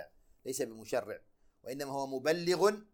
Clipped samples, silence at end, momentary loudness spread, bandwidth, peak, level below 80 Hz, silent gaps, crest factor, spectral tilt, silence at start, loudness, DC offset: under 0.1%; 0.1 s; 19 LU; 19.5 kHz; -16 dBFS; -72 dBFS; none; 20 dB; -4 dB/octave; 0 s; -34 LUFS; under 0.1%